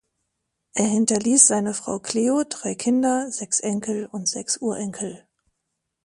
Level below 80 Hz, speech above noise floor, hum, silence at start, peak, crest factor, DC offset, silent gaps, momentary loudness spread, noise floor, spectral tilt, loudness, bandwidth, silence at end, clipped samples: -66 dBFS; 57 dB; none; 0.75 s; 0 dBFS; 24 dB; under 0.1%; none; 14 LU; -79 dBFS; -3 dB/octave; -21 LUFS; 11.5 kHz; 0.85 s; under 0.1%